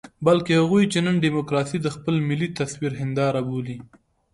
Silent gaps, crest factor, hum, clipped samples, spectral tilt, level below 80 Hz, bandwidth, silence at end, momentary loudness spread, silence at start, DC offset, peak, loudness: none; 18 dB; none; under 0.1%; -6.5 dB/octave; -56 dBFS; 11.5 kHz; 0.5 s; 9 LU; 0.05 s; under 0.1%; -4 dBFS; -22 LUFS